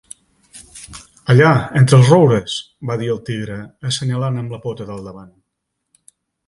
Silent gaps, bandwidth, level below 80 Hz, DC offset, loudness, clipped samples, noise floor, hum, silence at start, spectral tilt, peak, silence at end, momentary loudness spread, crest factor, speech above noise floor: none; 11.5 kHz; -50 dBFS; under 0.1%; -15 LUFS; under 0.1%; -75 dBFS; none; 0.55 s; -6.5 dB/octave; 0 dBFS; 1.25 s; 24 LU; 18 dB; 60 dB